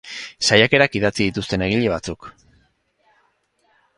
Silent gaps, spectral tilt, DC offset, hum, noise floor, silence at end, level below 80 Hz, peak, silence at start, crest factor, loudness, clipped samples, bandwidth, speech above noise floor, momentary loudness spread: none; -4 dB/octave; under 0.1%; none; -64 dBFS; 1.7 s; -46 dBFS; 0 dBFS; 0.05 s; 22 dB; -18 LUFS; under 0.1%; 11.5 kHz; 46 dB; 18 LU